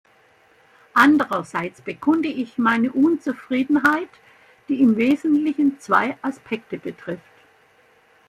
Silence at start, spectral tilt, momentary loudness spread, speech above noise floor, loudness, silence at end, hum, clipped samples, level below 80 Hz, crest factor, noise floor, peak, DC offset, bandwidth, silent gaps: 0.95 s; -5.5 dB/octave; 15 LU; 36 dB; -20 LUFS; 1.1 s; none; under 0.1%; -66 dBFS; 20 dB; -56 dBFS; -2 dBFS; under 0.1%; 15 kHz; none